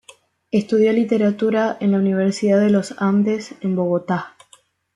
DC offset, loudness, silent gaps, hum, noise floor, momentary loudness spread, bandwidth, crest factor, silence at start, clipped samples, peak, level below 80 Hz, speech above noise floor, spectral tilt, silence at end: under 0.1%; -19 LUFS; none; none; -54 dBFS; 8 LU; 11 kHz; 14 dB; 0.55 s; under 0.1%; -4 dBFS; -64 dBFS; 37 dB; -7 dB/octave; 0.65 s